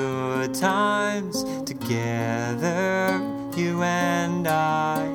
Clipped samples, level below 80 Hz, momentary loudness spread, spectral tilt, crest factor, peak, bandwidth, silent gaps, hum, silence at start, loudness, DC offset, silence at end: under 0.1%; -58 dBFS; 6 LU; -5 dB/octave; 16 dB; -8 dBFS; 20 kHz; none; none; 0 s; -24 LUFS; under 0.1%; 0 s